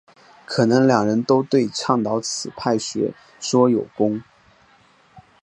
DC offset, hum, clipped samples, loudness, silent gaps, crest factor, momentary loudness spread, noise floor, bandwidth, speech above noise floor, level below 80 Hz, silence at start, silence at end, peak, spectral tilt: under 0.1%; none; under 0.1%; -20 LUFS; none; 20 dB; 10 LU; -55 dBFS; 10.5 kHz; 36 dB; -62 dBFS; 0.5 s; 0.25 s; -2 dBFS; -5 dB/octave